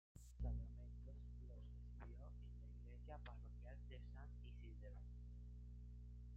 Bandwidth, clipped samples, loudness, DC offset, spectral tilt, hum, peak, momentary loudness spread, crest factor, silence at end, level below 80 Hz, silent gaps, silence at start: 7.2 kHz; under 0.1%; -57 LUFS; under 0.1%; -7.5 dB/octave; 60 Hz at -55 dBFS; -36 dBFS; 7 LU; 18 dB; 0 s; -56 dBFS; none; 0.15 s